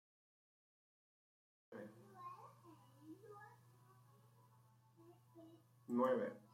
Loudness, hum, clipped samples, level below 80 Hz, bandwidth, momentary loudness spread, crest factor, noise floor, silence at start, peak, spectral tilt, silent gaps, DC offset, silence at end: -44 LUFS; none; under 0.1%; under -90 dBFS; 16 kHz; 27 LU; 24 dB; -71 dBFS; 1.7 s; -26 dBFS; -7.5 dB/octave; none; under 0.1%; 0.15 s